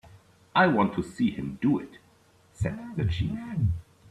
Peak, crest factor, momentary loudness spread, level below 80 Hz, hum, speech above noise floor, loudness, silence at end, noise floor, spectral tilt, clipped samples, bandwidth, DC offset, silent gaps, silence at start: -8 dBFS; 20 dB; 10 LU; -48 dBFS; none; 34 dB; -28 LUFS; 0.3 s; -60 dBFS; -7.5 dB/octave; under 0.1%; 12 kHz; under 0.1%; none; 0.05 s